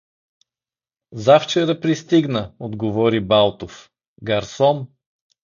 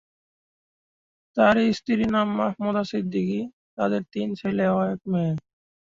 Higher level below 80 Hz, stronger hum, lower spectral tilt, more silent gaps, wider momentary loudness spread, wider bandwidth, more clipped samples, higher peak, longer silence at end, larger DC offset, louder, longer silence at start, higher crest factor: first, -52 dBFS vs -58 dBFS; neither; second, -6 dB/octave vs -7.5 dB/octave; second, 4.08-4.16 s vs 3.53-3.77 s; first, 19 LU vs 10 LU; about the same, 7.4 kHz vs 7.6 kHz; neither; first, 0 dBFS vs -6 dBFS; first, 0.6 s vs 0.45 s; neither; first, -18 LUFS vs -24 LUFS; second, 1.1 s vs 1.35 s; about the same, 20 dB vs 18 dB